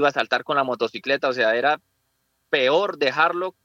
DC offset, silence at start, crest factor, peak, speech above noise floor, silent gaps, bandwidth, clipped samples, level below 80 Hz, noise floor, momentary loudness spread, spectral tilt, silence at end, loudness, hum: under 0.1%; 0 s; 18 dB; -4 dBFS; 50 dB; none; 8.2 kHz; under 0.1%; -78 dBFS; -71 dBFS; 5 LU; -4 dB/octave; 0.15 s; -21 LUFS; none